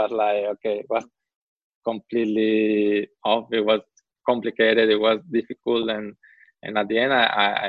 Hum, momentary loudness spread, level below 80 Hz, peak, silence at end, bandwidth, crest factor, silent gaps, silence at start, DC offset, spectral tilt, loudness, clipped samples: none; 10 LU; -66 dBFS; -4 dBFS; 0 s; 6.6 kHz; 20 dB; 1.36-1.56 s, 1.64-1.81 s; 0 s; under 0.1%; -6 dB/octave; -22 LUFS; under 0.1%